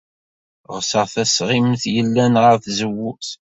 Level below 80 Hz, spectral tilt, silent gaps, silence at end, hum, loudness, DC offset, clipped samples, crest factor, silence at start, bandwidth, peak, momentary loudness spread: -56 dBFS; -4.5 dB/octave; none; 0.25 s; none; -17 LUFS; under 0.1%; under 0.1%; 18 dB; 0.7 s; 8 kHz; -2 dBFS; 12 LU